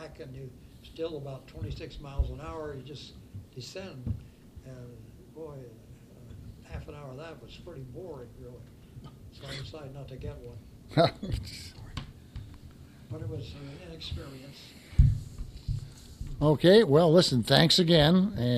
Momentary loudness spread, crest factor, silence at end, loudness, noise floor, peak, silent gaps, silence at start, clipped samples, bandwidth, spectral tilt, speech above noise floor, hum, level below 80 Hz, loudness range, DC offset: 27 LU; 24 dB; 0 s; -26 LUFS; -50 dBFS; -6 dBFS; none; 0 s; under 0.1%; 14.5 kHz; -6 dB/octave; 21 dB; none; -40 dBFS; 21 LU; under 0.1%